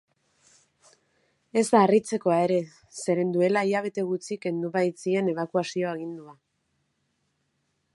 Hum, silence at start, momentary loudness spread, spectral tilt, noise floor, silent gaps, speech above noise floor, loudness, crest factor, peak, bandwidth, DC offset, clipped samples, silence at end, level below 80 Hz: none; 1.55 s; 10 LU; -6 dB/octave; -75 dBFS; none; 50 dB; -25 LUFS; 22 dB; -4 dBFS; 11.5 kHz; under 0.1%; under 0.1%; 1.65 s; -76 dBFS